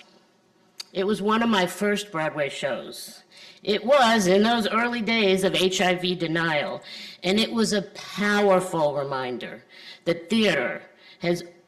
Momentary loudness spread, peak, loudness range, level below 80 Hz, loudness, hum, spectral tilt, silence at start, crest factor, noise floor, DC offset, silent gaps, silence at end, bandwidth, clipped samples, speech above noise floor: 15 LU; -8 dBFS; 5 LU; -62 dBFS; -23 LUFS; none; -4.5 dB/octave; 0.8 s; 16 dB; -61 dBFS; under 0.1%; none; 0.2 s; 14 kHz; under 0.1%; 37 dB